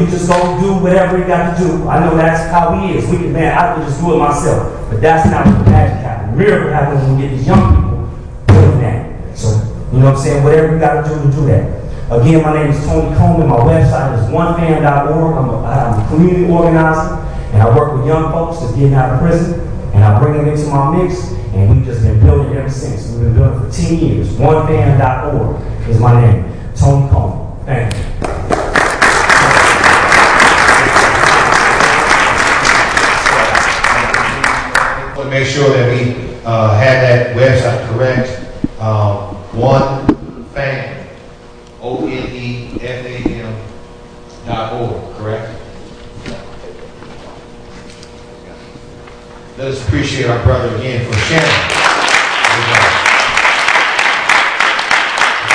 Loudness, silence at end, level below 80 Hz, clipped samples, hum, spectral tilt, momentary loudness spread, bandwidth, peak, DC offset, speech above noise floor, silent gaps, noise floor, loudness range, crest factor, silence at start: -11 LUFS; 0 s; -24 dBFS; 0.2%; none; -5.5 dB/octave; 13 LU; 11 kHz; 0 dBFS; under 0.1%; 24 dB; none; -35 dBFS; 14 LU; 12 dB; 0 s